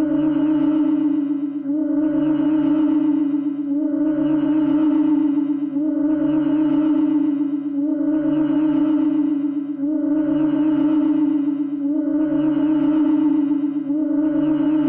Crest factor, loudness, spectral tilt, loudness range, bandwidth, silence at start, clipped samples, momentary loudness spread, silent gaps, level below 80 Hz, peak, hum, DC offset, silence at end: 8 dB; -19 LUFS; -11 dB/octave; 1 LU; 3.3 kHz; 0 s; under 0.1%; 5 LU; none; -58 dBFS; -12 dBFS; none; under 0.1%; 0 s